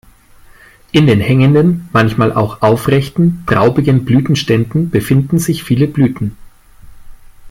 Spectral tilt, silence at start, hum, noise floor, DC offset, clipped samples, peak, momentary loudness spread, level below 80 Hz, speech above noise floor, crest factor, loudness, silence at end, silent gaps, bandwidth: -7 dB/octave; 0.95 s; none; -42 dBFS; under 0.1%; under 0.1%; 0 dBFS; 5 LU; -40 dBFS; 30 dB; 12 dB; -12 LUFS; 0 s; none; 16.5 kHz